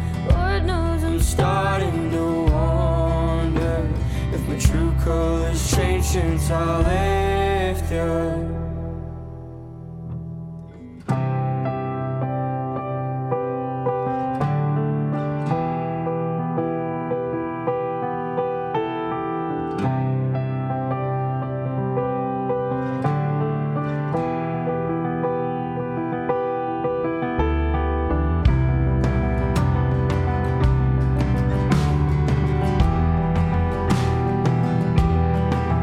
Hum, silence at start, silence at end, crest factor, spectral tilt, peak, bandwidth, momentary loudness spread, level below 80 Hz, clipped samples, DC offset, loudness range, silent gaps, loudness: none; 0 s; 0 s; 18 dB; -7 dB/octave; -2 dBFS; 15.5 kHz; 6 LU; -28 dBFS; under 0.1%; under 0.1%; 5 LU; none; -22 LUFS